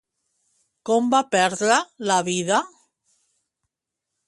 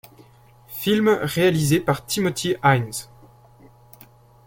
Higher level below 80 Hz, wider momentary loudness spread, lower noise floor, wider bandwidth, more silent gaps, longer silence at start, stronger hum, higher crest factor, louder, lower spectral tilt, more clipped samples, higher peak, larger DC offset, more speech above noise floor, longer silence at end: second, -72 dBFS vs -54 dBFS; second, 5 LU vs 10 LU; first, -84 dBFS vs -51 dBFS; second, 11.5 kHz vs 17 kHz; neither; first, 0.85 s vs 0.7 s; neither; about the same, 20 dB vs 20 dB; about the same, -21 LUFS vs -21 LUFS; second, -3 dB/octave vs -5 dB/octave; neither; about the same, -4 dBFS vs -4 dBFS; neither; first, 63 dB vs 31 dB; first, 1.6 s vs 1.4 s